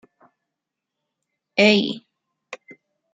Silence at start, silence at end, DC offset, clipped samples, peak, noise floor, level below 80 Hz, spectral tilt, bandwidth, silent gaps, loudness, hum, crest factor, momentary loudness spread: 1.55 s; 0.6 s; under 0.1%; under 0.1%; -2 dBFS; -83 dBFS; -74 dBFS; -5 dB/octave; 9 kHz; none; -18 LUFS; none; 22 dB; 25 LU